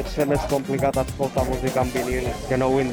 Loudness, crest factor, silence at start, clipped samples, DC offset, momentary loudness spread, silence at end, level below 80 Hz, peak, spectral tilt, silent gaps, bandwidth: -23 LUFS; 16 dB; 0 s; under 0.1%; under 0.1%; 4 LU; 0 s; -36 dBFS; -8 dBFS; -6 dB/octave; none; over 20 kHz